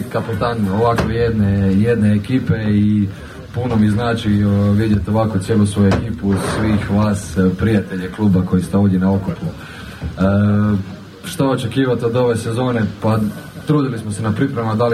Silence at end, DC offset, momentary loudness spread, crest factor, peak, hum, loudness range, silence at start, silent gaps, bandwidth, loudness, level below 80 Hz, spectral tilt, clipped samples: 0 s; under 0.1%; 9 LU; 12 dB; -4 dBFS; none; 2 LU; 0 s; none; 14 kHz; -17 LUFS; -36 dBFS; -7.5 dB/octave; under 0.1%